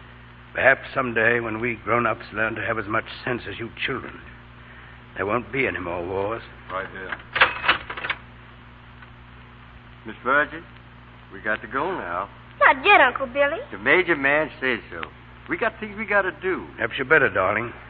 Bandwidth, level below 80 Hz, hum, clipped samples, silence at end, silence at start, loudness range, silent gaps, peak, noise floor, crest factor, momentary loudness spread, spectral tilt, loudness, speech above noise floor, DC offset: 5 kHz; -50 dBFS; 60 Hz at -45 dBFS; under 0.1%; 0 s; 0 s; 9 LU; none; -2 dBFS; -45 dBFS; 24 dB; 15 LU; -8.5 dB/octave; -22 LUFS; 22 dB; under 0.1%